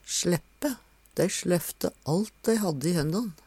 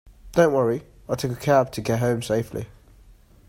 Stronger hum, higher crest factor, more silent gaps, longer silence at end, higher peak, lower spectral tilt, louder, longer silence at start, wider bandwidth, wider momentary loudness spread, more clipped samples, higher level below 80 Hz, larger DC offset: neither; about the same, 18 dB vs 20 dB; neither; second, 0.15 s vs 0.85 s; second, -12 dBFS vs -4 dBFS; about the same, -5 dB/octave vs -6 dB/octave; second, -28 LUFS vs -23 LUFS; about the same, 0.05 s vs 0.05 s; about the same, 16.5 kHz vs 16.5 kHz; second, 7 LU vs 12 LU; neither; second, -56 dBFS vs -50 dBFS; neither